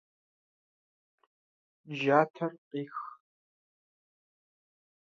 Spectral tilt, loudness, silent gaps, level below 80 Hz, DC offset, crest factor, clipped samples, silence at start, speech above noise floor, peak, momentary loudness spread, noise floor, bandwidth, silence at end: -4.5 dB/octave; -31 LUFS; 2.30-2.34 s, 2.58-2.71 s; -88 dBFS; under 0.1%; 28 dB; under 0.1%; 1.85 s; over 60 dB; -10 dBFS; 16 LU; under -90 dBFS; 7.2 kHz; 1.9 s